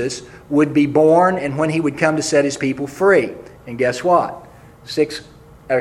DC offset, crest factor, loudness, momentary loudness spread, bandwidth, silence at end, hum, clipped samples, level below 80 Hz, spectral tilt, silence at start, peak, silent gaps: under 0.1%; 16 dB; -17 LUFS; 14 LU; 13.5 kHz; 0 s; none; under 0.1%; -52 dBFS; -5.5 dB/octave; 0 s; 0 dBFS; none